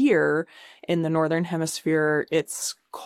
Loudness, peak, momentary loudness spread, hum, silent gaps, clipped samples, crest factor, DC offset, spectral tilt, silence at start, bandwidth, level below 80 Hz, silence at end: -24 LUFS; -10 dBFS; 8 LU; none; none; under 0.1%; 14 dB; under 0.1%; -5 dB/octave; 0 s; 16 kHz; -68 dBFS; 0 s